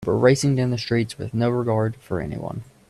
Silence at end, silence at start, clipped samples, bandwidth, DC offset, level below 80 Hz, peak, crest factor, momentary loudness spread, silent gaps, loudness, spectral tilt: 0.25 s; 0 s; under 0.1%; 13 kHz; under 0.1%; -50 dBFS; -2 dBFS; 20 dB; 12 LU; none; -22 LUFS; -6.5 dB/octave